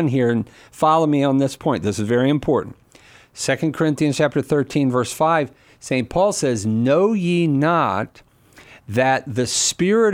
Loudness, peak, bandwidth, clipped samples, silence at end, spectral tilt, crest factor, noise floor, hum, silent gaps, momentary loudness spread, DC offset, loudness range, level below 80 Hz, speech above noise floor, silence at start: -19 LUFS; -4 dBFS; 16 kHz; under 0.1%; 0 s; -5 dB/octave; 16 dB; -49 dBFS; none; none; 8 LU; under 0.1%; 2 LU; -52 dBFS; 30 dB; 0 s